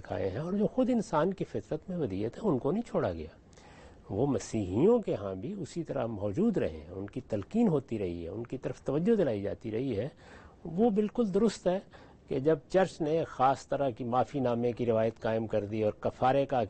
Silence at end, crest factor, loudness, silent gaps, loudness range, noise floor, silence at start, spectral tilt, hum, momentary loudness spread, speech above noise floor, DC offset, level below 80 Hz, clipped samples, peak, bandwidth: 0 s; 16 dB; -31 LUFS; none; 3 LU; -53 dBFS; 0 s; -7.5 dB/octave; none; 10 LU; 23 dB; under 0.1%; -58 dBFS; under 0.1%; -14 dBFS; 8.4 kHz